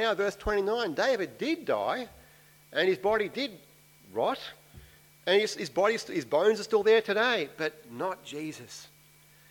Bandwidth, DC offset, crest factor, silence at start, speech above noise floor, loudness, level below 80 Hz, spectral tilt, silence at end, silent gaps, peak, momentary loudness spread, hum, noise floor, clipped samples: 19 kHz; under 0.1%; 18 dB; 0 s; 30 dB; -29 LUFS; -56 dBFS; -4 dB/octave; 0.65 s; none; -12 dBFS; 13 LU; none; -58 dBFS; under 0.1%